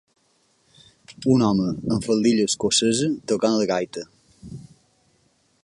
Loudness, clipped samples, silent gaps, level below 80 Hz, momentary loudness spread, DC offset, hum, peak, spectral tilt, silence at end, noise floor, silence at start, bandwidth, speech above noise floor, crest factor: -21 LUFS; under 0.1%; none; -54 dBFS; 22 LU; under 0.1%; none; -6 dBFS; -4.5 dB/octave; 1 s; -64 dBFS; 1.1 s; 11.5 kHz; 44 dB; 18 dB